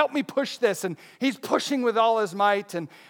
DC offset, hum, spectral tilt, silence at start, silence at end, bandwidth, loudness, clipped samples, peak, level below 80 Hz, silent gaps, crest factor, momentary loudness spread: under 0.1%; none; -4 dB/octave; 0 s; 0.2 s; 19 kHz; -25 LUFS; under 0.1%; -6 dBFS; -86 dBFS; none; 18 dB; 7 LU